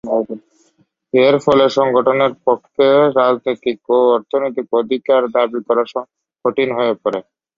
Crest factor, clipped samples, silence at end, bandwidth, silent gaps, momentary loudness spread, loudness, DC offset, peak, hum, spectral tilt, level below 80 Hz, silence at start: 14 dB; under 0.1%; 0.35 s; 7.6 kHz; none; 10 LU; -15 LUFS; under 0.1%; -2 dBFS; none; -6 dB/octave; -60 dBFS; 0.05 s